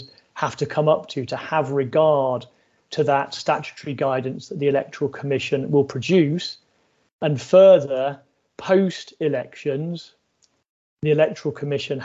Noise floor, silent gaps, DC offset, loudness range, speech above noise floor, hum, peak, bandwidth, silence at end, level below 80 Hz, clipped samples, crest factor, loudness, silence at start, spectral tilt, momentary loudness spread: -65 dBFS; 7.13-7.19 s, 10.69-10.97 s; under 0.1%; 5 LU; 45 dB; none; -2 dBFS; 8 kHz; 0 s; -64 dBFS; under 0.1%; 18 dB; -21 LUFS; 0 s; -6.5 dB/octave; 12 LU